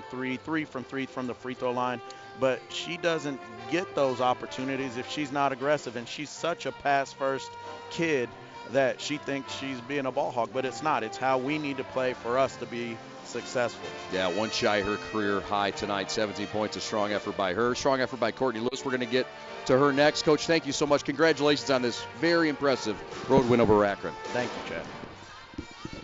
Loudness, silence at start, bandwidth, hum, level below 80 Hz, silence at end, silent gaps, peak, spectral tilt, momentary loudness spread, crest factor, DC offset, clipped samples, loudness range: -28 LUFS; 0 s; 8 kHz; none; -58 dBFS; 0 s; none; -10 dBFS; -4.5 dB/octave; 12 LU; 18 dB; under 0.1%; under 0.1%; 5 LU